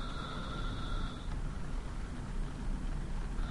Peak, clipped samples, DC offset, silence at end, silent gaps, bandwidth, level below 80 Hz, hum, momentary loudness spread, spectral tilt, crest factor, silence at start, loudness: -24 dBFS; under 0.1%; under 0.1%; 0 s; none; 11.5 kHz; -38 dBFS; none; 3 LU; -6 dB/octave; 12 dB; 0 s; -42 LUFS